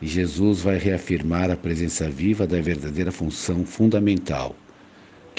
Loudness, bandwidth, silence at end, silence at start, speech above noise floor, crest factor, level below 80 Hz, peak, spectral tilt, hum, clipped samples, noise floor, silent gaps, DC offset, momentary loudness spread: -23 LUFS; 9.8 kHz; 0 s; 0 s; 26 dB; 16 dB; -44 dBFS; -6 dBFS; -6 dB/octave; none; under 0.1%; -48 dBFS; none; under 0.1%; 7 LU